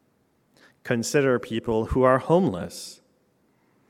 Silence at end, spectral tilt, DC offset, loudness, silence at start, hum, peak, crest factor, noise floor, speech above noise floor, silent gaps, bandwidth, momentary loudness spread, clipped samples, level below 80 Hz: 0.95 s; -5.5 dB/octave; under 0.1%; -23 LUFS; 0.85 s; none; -6 dBFS; 20 dB; -66 dBFS; 44 dB; none; 16.5 kHz; 17 LU; under 0.1%; -46 dBFS